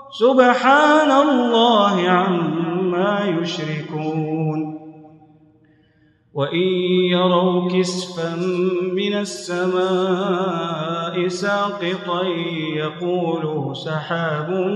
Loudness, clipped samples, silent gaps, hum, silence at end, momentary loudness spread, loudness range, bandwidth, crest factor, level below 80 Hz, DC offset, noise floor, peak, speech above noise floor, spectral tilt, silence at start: -19 LUFS; under 0.1%; none; none; 0 s; 11 LU; 8 LU; 11 kHz; 18 dB; -70 dBFS; under 0.1%; -57 dBFS; 0 dBFS; 38 dB; -6 dB/octave; 0 s